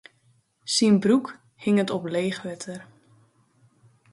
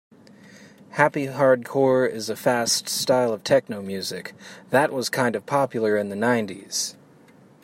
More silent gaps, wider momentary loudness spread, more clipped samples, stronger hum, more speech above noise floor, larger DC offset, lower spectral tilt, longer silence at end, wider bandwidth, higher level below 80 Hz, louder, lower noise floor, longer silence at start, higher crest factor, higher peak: neither; first, 20 LU vs 10 LU; neither; neither; first, 41 dB vs 29 dB; neither; first, -5 dB/octave vs -3.5 dB/octave; first, 1.3 s vs 0.7 s; second, 11.5 kHz vs 16 kHz; about the same, -70 dBFS vs -70 dBFS; about the same, -24 LUFS vs -23 LUFS; first, -64 dBFS vs -52 dBFS; about the same, 0.65 s vs 0.55 s; about the same, 18 dB vs 22 dB; second, -8 dBFS vs -2 dBFS